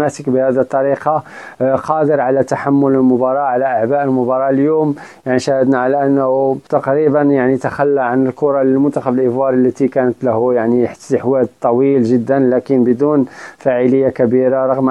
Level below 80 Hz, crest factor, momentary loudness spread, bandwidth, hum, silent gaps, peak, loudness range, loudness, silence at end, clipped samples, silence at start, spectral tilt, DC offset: -56 dBFS; 14 dB; 4 LU; 10 kHz; none; none; 0 dBFS; 1 LU; -14 LUFS; 0 s; under 0.1%; 0 s; -8 dB/octave; under 0.1%